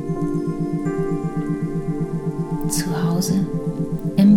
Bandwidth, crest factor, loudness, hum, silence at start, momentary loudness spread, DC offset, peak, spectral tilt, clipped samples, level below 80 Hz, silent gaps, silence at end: 18 kHz; 16 dB; -23 LUFS; none; 0 s; 5 LU; under 0.1%; -4 dBFS; -6.5 dB/octave; under 0.1%; -38 dBFS; none; 0 s